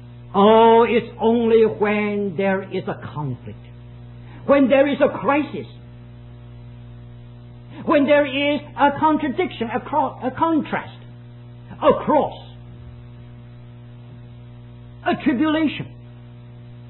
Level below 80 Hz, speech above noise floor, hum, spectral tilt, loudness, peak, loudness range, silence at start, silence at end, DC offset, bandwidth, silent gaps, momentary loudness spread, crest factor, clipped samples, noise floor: -50 dBFS; 22 dB; 60 Hz at -40 dBFS; -11 dB/octave; -19 LUFS; -2 dBFS; 6 LU; 0 s; 0 s; under 0.1%; 4.2 kHz; none; 25 LU; 18 dB; under 0.1%; -40 dBFS